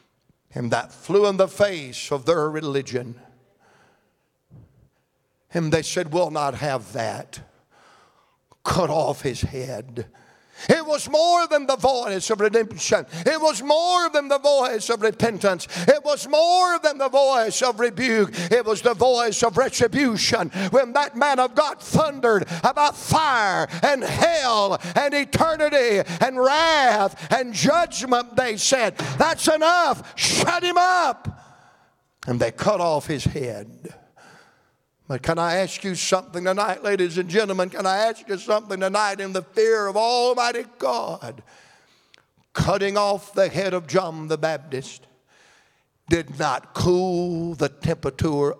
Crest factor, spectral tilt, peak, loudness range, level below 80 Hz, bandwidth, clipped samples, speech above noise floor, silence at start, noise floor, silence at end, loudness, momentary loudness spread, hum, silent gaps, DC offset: 20 dB; -4 dB/octave; -2 dBFS; 7 LU; -52 dBFS; 16 kHz; under 0.1%; 49 dB; 0.55 s; -70 dBFS; 0.05 s; -21 LUFS; 10 LU; none; none; under 0.1%